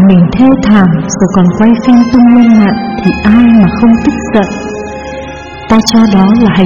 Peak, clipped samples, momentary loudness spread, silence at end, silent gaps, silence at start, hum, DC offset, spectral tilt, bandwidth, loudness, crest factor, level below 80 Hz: 0 dBFS; 2%; 15 LU; 0 s; none; 0 s; none; 0.8%; -6.5 dB/octave; 7.4 kHz; -6 LUFS; 6 dB; -30 dBFS